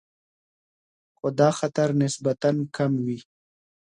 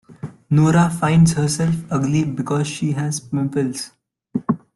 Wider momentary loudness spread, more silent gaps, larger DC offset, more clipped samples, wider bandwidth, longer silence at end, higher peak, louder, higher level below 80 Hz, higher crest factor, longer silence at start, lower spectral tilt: second, 9 LU vs 14 LU; neither; neither; neither; about the same, 11.5 kHz vs 12 kHz; first, 0.7 s vs 0.2 s; second, -6 dBFS vs -2 dBFS; second, -24 LUFS vs -19 LUFS; second, -68 dBFS vs -48 dBFS; about the same, 20 dB vs 16 dB; first, 1.25 s vs 0.1 s; about the same, -6.5 dB/octave vs -6 dB/octave